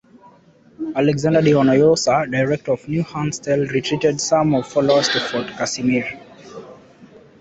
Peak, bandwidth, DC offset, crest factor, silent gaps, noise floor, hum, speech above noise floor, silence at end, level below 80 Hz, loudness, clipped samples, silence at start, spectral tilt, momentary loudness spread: -2 dBFS; 8.4 kHz; under 0.1%; 16 dB; none; -50 dBFS; none; 33 dB; 0.35 s; -54 dBFS; -18 LUFS; under 0.1%; 0.8 s; -5 dB/octave; 15 LU